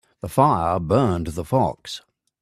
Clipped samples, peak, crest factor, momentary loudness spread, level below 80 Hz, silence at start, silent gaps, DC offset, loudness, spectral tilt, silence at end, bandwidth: under 0.1%; -2 dBFS; 20 dB; 16 LU; -46 dBFS; 0.25 s; none; under 0.1%; -21 LUFS; -7 dB/octave; 0.4 s; 15 kHz